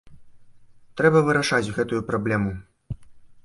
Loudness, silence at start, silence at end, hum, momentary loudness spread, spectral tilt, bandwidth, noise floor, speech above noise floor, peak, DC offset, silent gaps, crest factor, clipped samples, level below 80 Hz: -22 LUFS; 0.05 s; 0.05 s; none; 20 LU; -6 dB/octave; 11.5 kHz; -48 dBFS; 27 dB; -4 dBFS; under 0.1%; none; 20 dB; under 0.1%; -50 dBFS